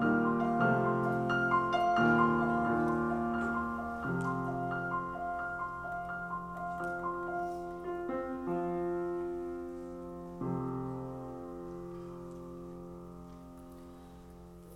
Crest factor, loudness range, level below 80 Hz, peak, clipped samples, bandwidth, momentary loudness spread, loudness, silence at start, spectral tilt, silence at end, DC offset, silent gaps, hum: 18 dB; 13 LU; -56 dBFS; -16 dBFS; under 0.1%; 12.5 kHz; 19 LU; -34 LUFS; 0 s; -8 dB/octave; 0 s; under 0.1%; none; none